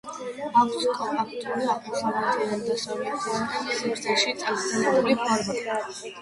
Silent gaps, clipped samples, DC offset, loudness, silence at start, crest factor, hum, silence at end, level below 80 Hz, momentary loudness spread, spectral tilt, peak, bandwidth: none; under 0.1%; under 0.1%; -26 LUFS; 0.05 s; 18 dB; none; 0 s; -66 dBFS; 7 LU; -3 dB/octave; -8 dBFS; 11.5 kHz